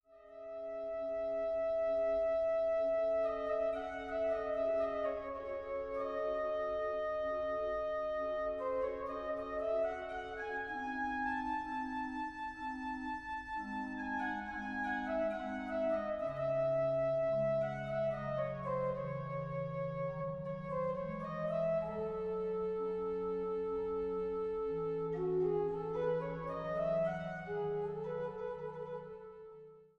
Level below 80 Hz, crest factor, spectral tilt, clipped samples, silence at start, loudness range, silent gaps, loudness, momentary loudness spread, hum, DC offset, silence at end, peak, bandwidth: -62 dBFS; 12 dB; -8 dB/octave; under 0.1%; 0.1 s; 5 LU; none; -38 LUFS; 8 LU; none; under 0.1%; 0.15 s; -24 dBFS; 7 kHz